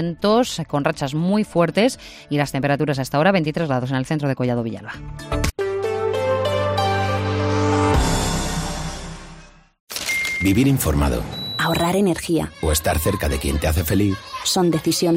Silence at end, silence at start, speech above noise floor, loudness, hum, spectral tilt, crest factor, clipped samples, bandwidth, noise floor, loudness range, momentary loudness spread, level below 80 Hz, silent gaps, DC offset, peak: 0 s; 0 s; 24 dB; -20 LUFS; none; -5 dB/octave; 18 dB; under 0.1%; 16 kHz; -44 dBFS; 2 LU; 8 LU; -32 dBFS; 9.80-9.87 s; under 0.1%; -4 dBFS